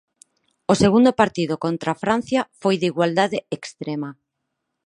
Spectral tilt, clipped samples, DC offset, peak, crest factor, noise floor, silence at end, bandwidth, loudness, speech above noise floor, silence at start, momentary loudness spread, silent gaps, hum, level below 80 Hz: -5.5 dB/octave; under 0.1%; under 0.1%; -2 dBFS; 20 dB; -78 dBFS; 0.7 s; 11 kHz; -20 LUFS; 58 dB; 0.7 s; 14 LU; none; none; -54 dBFS